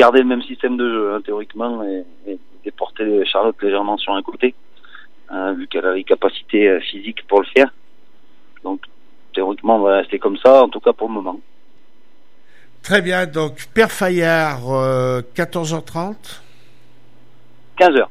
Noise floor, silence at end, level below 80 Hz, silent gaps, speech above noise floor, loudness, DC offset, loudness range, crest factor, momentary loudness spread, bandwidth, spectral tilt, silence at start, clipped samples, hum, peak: -58 dBFS; 0.05 s; -58 dBFS; none; 41 dB; -17 LUFS; 2%; 4 LU; 18 dB; 15 LU; 15.5 kHz; -5.5 dB/octave; 0 s; under 0.1%; none; 0 dBFS